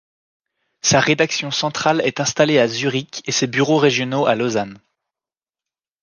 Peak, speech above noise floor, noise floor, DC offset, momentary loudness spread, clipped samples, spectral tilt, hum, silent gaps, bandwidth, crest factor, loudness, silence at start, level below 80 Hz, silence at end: -2 dBFS; over 72 dB; under -90 dBFS; under 0.1%; 7 LU; under 0.1%; -3.5 dB/octave; none; none; 10.5 kHz; 18 dB; -18 LUFS; 0.85 s; -60 dBFS; 1.25 s